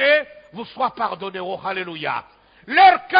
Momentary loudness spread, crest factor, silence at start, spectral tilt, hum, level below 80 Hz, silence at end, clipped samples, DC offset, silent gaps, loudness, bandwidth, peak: 19 LU; 18 dB; 0 s; -7.5 dB/octave; none; -64 dBFS; 0 s; under 0.1%; under 0.1%; none; -20 LUFS; 5.2 kHz; -2 dBFS